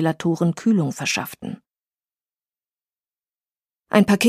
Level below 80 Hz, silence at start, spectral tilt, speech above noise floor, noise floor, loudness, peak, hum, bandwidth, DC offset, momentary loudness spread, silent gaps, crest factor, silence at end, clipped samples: -62 dBFS; 0 s; -5.5 dB/octave; over 71 dB; under -90 dBFS; -21 LUFS; -2 dBFS; none; 15.5 kHz; under 0.1%; 16 LU; none; 20 dB; 0 s; under 0.1%